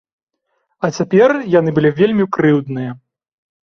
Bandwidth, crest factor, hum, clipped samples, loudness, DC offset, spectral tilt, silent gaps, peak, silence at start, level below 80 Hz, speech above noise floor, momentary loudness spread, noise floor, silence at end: 7 kHz; 14 dB; none; under 0.1%; -15 LUFS; under 0.1%; -7.5 dB/octave; none; -2 dBFS; 0.8 s; -54 dBFS; 55 dB; 11 LU; -68 dBFS; 0.65 s